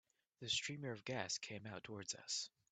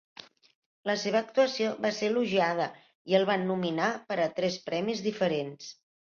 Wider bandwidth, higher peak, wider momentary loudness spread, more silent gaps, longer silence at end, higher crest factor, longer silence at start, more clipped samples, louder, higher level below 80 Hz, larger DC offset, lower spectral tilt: first, 9 kHz vs 7.2 kHz; second, -24 dBFS vs -10 dBFS; second, 10 LU vs 13 LU; second, none vs 2.95-3.05 s; about the same, 0.25 s vs 0.3 s; about the same, 24 dB vs 20 dB; second, 0.4 s vs 0.85 s; neither; second, -44 LUFS vs -29 LUFS; second, -82 dBFS vs -74 dBFS; neither; second, -2 dB/octave vs -5 dB/octave